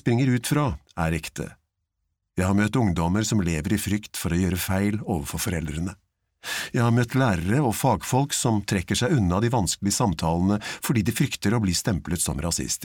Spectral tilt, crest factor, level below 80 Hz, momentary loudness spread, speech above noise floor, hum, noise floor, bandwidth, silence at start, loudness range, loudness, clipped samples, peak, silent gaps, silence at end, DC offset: -5 dB/octave; 14 dB; -42 dBFS; 7 LU; 55 dB; none; -78 dBFS; 19.5 kHz; 0.05 s; 3 LU; -24 LUFS; under 0.1%; -10 dBFS; none; 0 s; under 0.1%